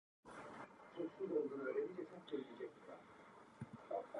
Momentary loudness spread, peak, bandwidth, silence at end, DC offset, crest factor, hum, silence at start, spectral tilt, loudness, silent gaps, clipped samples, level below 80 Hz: 17 LU; -30 dBFS; 11 kHz; 0 s; under 0.1%; 18 dB; none; 0.25 s; -7 dB/octave; -48 LUFS; none; under 0.1%; -84 dBFS